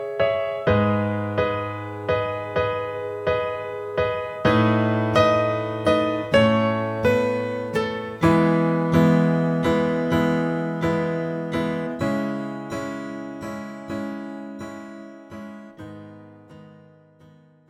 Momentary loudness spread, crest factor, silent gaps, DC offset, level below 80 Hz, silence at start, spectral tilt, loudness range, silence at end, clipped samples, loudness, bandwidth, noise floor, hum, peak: 16 LU; 18 dB; none; under 0.1%; -50 dBFS; 0 s; -7.5 dB/octave; 14 LU; 0.95 s; under 0.1%; -22 LUFS; 13 kHz; -52 dBFS; none; -4 dBFS